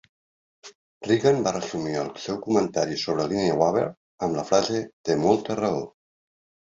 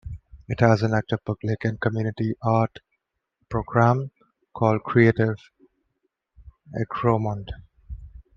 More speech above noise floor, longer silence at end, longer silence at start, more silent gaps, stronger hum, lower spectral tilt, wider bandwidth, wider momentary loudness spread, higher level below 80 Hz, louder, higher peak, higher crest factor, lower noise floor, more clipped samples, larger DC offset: first, over 66 dB vs 55 dB; first, 0.85 s vs 0.15 s; first, 0.65 s vs 0.05 s; first, 0.75-1.01 s, 3.97-4.18 s, 4.93-5.04 s vs none; neither; second, -5 dB/octave vs -8.5 dB/octave; first, 7.8 kHz vs 6.8 kHz; second, 9 LU vs 22 LU; second, -60 dBFS vs -48 dBFS; about the same, -25 LUFS vs -23 LUFS; about the same, -4 dBFS vs -2 dBFS; about the same, 20 dB vs 22 dB; first, under -90 dBFS vs -77 dBFS; neither; neither